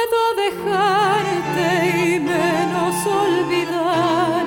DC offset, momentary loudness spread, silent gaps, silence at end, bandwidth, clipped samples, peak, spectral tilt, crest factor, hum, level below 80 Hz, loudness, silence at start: under 0.1%; 3 LU; none; 0 s; 18 kHz; under 0.1%; -6 dBFS; -4.5 dB/octave; 12 dB; none; -54 dBFS; -18 LUFS; 0 s